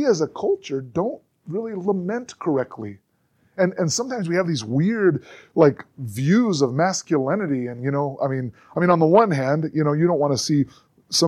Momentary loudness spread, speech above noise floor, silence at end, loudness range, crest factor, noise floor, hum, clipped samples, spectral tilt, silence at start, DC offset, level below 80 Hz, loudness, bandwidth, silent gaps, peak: 11 LU; 43 dB; 0 s; 6 LU; 18 dB; -64 dBFS; none; under 0.1%; -5.5 dB/octave; 0 s; under 0.1%; -64 dBFS; -22 LUFS; 14 kHz; none; -2 dBFS